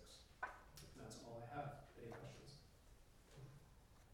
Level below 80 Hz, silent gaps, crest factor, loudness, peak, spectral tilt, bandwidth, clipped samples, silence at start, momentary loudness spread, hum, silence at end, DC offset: -70 dBFS; none; 24 dB; -56 LUFS; -32 dBFS; -5 dB/octave; 17.5 kHz; under 0.1%; 0 s; 17 LU; none; 0 s; under 0.1%